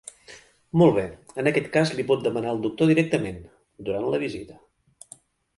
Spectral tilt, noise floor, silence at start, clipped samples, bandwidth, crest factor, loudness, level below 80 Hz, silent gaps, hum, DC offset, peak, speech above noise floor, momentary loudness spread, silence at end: -6.5 dB/octave; -52 dBFS; 0.3 s; under 0.1%; 11.5 kHz; 20 dB; -24 LUFS; -56 dBFS; none; none; under 0.1%; -4 dBFS; 29 dB; 17 LU; 1.05 s